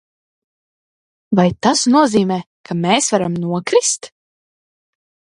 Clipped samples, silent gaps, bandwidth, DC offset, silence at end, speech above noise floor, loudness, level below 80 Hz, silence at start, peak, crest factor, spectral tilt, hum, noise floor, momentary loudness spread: under 0.1%; 2.46-2.64 s; 11.5 kHz; under 0.1%; 1.2 s; over 75 dB; -16 LUFS; -54 dBFS; 1.3 s; 0 dBFS; 18 dB; -4 dB/octave; none; under -90 dBFS; 9 LU